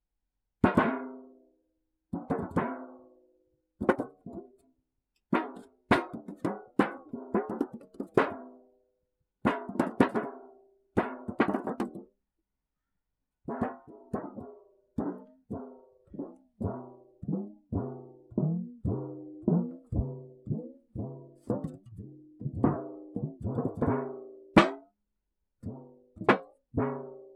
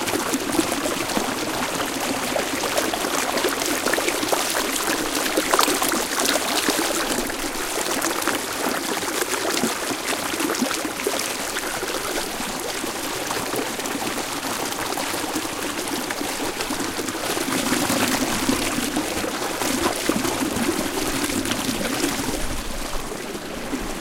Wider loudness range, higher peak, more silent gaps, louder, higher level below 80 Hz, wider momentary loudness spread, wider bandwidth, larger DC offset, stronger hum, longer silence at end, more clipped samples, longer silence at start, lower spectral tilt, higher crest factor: first, 10 LU vs 5 LU; second, -4 dBFS vs 0 dBFS; neither; second, -32 LUFS vs -23 LUFS; second, -54 dBFS vs -42 dBFS; first, 19 LU vs 6 LU; second, 12 kHz vs 17 kHz; neither; neither; about the same, 0 s vs 0 s; neither; first, 0.65 s vs 0 s; first, -7.5 dB/octave vs -2 dB/octave; about the same, 28 dB vs 24 dB